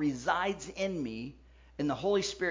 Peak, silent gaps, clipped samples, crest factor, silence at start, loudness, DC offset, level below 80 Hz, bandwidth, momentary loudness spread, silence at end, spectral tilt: -16 dBFS; none; under 0.1%; 18 dB; 0 s; -33 LUFS; under 0.1%; -58 dBFS; 7.6 kHz; 13 LU; 0 s; -4.5 dB/octave